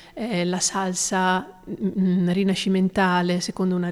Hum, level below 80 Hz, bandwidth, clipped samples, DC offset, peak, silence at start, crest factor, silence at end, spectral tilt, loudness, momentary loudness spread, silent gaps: none; -56 dBFS; 13 kHz; under 0.1%; under 0.1%; -8 dBFS; 0 s; 14 dB; 0 s; -4.5 dB/octave; -22 LUFS; 7 LU; none